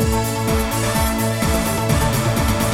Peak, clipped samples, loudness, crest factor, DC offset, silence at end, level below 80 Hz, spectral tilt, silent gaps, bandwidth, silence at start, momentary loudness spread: -6 dBFS; under 0.1%; -19 LUFS; 12 dB; 0.5%; 0 s; -26 dBFS; -5 dB/octave; none; 17 kHz; 0 s; 2 LU